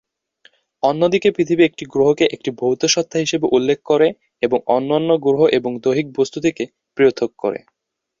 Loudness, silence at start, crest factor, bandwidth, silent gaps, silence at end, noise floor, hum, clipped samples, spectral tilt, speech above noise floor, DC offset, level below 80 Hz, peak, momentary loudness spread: -18 LUFS; 0.85 s; 16 dB; 7.6 kHz; none; 0.65 s; -55 dBFS; none; under 0.1%; -4.5 dB/octave; 38 dB; under 0.1%; -60 dBFS; -2 dBFS; 7 LU